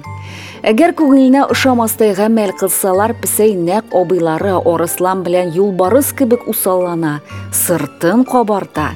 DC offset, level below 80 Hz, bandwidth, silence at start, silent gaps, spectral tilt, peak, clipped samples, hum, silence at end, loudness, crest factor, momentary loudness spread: under 0.1%; -52 dBFS; over 20 kHz; 0.05 s; none; -4.5 dB/octave; 0 dBFS; under 0.1%; none; 0 s; -13 LUFS; 12 dB; 7 LU